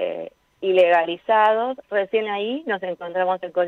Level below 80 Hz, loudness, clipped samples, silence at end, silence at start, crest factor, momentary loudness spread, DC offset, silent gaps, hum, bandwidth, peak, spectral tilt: -72 dBFS; -21 LUFS; under 0.1%; 0 s; 0 s; 16 dB; 11 LU; under 0.1%; none; none; 6 kHz; -6 dBFS; -6 dB/octave